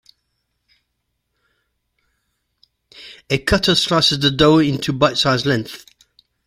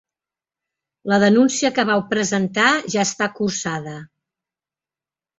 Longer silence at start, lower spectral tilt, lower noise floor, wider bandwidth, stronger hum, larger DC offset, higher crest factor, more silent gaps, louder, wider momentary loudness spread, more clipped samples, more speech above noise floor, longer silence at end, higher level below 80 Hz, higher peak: first, 3 s vs 1.05 s; about the same, -4.5 dB/octave vs -4 dB/octave; second, -73 dBFS vs under -90 dBFS; first, 16 kHz vs 8.2 kHz; neither; neither; about the same, 20 dB vs 18 dB; neither; about the same, -16 LUFS vs -18 LUFS; first, 20 LU vs 13 LU; neither; second, 57 dB vs over 71 dB; second, 0.7 s vs 1.3 s; first, -42 dBFS vs -62 dBFS; about the same, 0 dBFS vs -2 dBFS